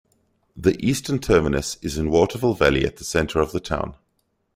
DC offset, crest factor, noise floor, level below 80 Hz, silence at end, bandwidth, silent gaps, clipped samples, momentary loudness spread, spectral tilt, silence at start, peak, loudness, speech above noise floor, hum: under 0.1%; 20 dB; -70 dBFS; -38 dBFS; 0.6 s; 16 kHz; none; under 0.1%; 8 LU; -5.5 dB/octave; 0.55 s; -2 dBFS; -22 LUFS; 50 dB; none